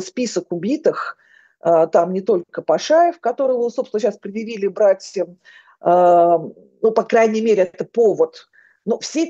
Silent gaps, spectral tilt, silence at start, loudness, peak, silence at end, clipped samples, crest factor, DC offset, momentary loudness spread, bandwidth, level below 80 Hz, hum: none; -5 dB/octave; 0 s; -18 LUFS; 0 dBFS; 0 s; under 0.1%; 18 dB; under 0.1%; 11 LU; 8.2 kHz; -74 dBFS; none